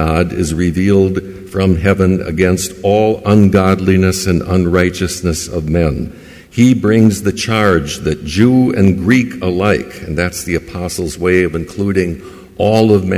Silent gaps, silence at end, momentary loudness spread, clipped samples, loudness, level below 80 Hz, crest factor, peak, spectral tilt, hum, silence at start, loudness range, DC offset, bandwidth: none; 0 s; 9 LU; under 0.1%; -13 LUFS; -28 dBFS; 12 dB; 0 dBFS; -6 dB/octave; none; 0 s; 3 LU; under 0.1%; 16 kHz